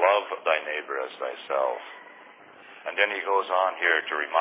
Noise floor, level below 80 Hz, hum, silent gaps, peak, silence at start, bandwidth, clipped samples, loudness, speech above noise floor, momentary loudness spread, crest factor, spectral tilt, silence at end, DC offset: -49 dBFS; under -90 dBFS; none; none; -6 dBFS; 0 s; 4 kHz; under 0.1%; -26 LUFS; 23 dB; 13 LU; 20 dB; -4 dB/octave; 0 s; under 0.1%